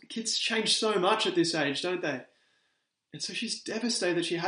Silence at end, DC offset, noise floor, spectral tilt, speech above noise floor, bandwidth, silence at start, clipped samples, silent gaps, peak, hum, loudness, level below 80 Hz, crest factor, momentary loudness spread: 0 s; under 0.1%; -77 dBFS; -2.5 dB/octave; 48 dB; 10 kHz; 0.1 s; under 0.1%; none; -12 dBFS; none; -28 LUFS; -82 dBFS; 18 dB; 9 LU